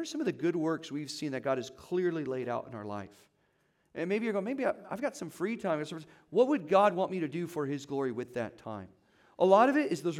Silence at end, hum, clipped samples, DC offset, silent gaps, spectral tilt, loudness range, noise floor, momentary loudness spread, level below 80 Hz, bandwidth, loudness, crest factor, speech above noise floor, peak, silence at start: 0 s; none; under 0.1%; under 0.1%; none; -6 dB/octave; 5 LU; -73 dBFS; 15 LU; -78 dBFS; 15.5 kHz; -31 LUFS; 22 dB; 42 dB; -10 dBFS; 0 s